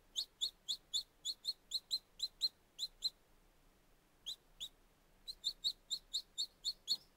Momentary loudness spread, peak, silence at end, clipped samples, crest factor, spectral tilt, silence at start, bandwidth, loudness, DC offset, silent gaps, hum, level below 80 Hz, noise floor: 10 LU; -26 dBFS; 0.15 s; under 0.1%; 20 dB; 1.5 dB/octave; 0.15 s; 16 kHz; -42 LUFS; under 0.1%; none; none; -72 dBFS; -71 dBFS